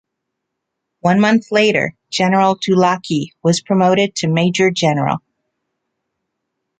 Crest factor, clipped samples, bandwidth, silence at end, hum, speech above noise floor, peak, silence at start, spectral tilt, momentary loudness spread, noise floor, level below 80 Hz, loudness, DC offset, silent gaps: 16 dB; under 0.1%; 9.2 kHz; 1.6 s; none; 62 dB; -2 dBFS; 1.05 s; -5.5 dB/octave; 7 LU; -77 dBFS; -58 dBFS; -15 LUFS; under 0.1%; none